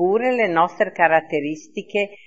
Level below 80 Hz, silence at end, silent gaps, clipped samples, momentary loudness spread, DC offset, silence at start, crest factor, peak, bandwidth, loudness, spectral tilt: -74 dBFS; 0.1 s; none; under 0.1%; 9 LU; 0.3%; 0 s; 20 dB; 0 dBFS; 8 kHz; -20 LUFS; -5.5 dB/octave